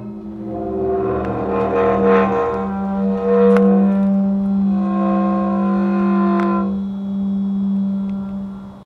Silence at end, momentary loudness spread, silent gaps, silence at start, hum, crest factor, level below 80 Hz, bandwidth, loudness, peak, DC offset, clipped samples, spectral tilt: 0 s; 10 LU; none; 0 s; none; 14 dB; -42 dBFS; 4.5 kHz; -17 LUFS; -2 dBFS; under 0.1%; under 0.1%; -10 dB/octave